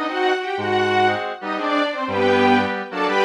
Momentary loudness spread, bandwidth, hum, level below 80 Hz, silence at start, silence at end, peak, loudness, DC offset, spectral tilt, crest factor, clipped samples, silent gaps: 8 LU; 11 kHz; none; -74 dBFS; 0 s; 0 s; -4 dBFS; -20 LUFS; under 0.1%; -5 dB/octave; 16 dB; under 0.1%; none